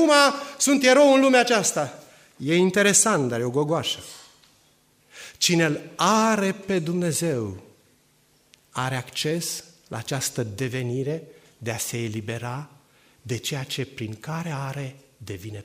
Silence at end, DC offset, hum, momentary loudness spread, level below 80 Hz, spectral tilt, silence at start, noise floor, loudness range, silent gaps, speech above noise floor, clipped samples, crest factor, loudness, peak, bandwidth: 0 s; under 0.1%; none; 18 LU; -64 dBFS; -3.5 dB/octave; 0 s; -62 dBFS; 12 LU; none; 39 dB; under 0.1%; 22 dB; -23 LUFS; -2 dBFS; 15.5 kHz